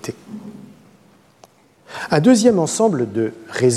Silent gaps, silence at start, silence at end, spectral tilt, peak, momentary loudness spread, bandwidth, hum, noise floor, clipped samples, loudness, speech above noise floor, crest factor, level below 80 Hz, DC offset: none; 0.05 s; 0 s; -5.5 dB/octave; -2 dBFS; 23 LU; 13.5 kHz; none; -52 dBFS; under 0.1%; -17 LUFS; 36 dB; 16 dB; -60 dBFS; under 0.1%